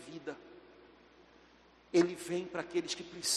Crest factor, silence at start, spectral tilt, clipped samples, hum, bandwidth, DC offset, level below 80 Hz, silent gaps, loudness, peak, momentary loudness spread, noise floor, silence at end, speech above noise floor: 22 dB; 0 s; -3 dB/octave; under 0.1%; none; 13 kHz; under 0.1%; -74 dBFS; none; -35 LUFS; -16 dBFS; 21 LU; -63 dBFS; 0 s; 29 dB